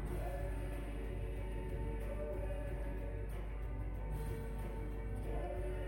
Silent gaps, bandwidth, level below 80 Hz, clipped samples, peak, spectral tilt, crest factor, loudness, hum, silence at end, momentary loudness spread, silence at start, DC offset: none; 16 kHz; -42 dBFS; under 0.1%; -28 dBFS; -7.5 dB/octave; 12 dB; -44 LUFS; none; 0 s; 2 LU; 0 s; under 0.1%